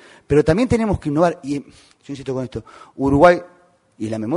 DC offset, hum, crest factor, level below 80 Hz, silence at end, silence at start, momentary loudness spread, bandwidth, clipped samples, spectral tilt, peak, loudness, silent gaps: under 0.1%; none; 20 dB; -40 dBFS; 0 s; 0.3 s; 17 LU; 11 kHz; under 0.1%; -7 dB/octave; 0 dBFS; -18 LUFS; none